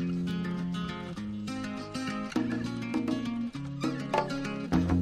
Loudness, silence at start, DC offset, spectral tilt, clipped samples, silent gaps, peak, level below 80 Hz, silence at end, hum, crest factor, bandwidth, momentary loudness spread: -33 LUFS; 0 s; under 0.1%; -6.5 dB/octave; under 0.1%; none; -10 dBFS; -50 dBFS; 0 s; none; 22 dB; 12.5 kHz; 6 LU